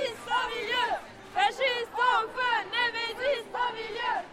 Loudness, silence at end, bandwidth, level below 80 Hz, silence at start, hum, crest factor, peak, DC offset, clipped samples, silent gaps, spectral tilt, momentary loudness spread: -28 LUFS; 0 s; 16 kHz; -62 dBFS; 0 s; none; 16 dB; -12 dBFS; under 0.1%; under 0.1%; none; -1.5 dB/octave; 6 LU